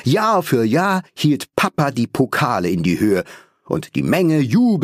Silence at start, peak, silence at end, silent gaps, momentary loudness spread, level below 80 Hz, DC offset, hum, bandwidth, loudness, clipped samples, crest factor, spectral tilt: 0.05 s; -2 dBFS; 0 s; none; 6 LU; -52 dBFS; under 0.1%; none; 15.5 kHz; -18 LUFS; under 0.1%; 16 dB; -6.5 dB/octave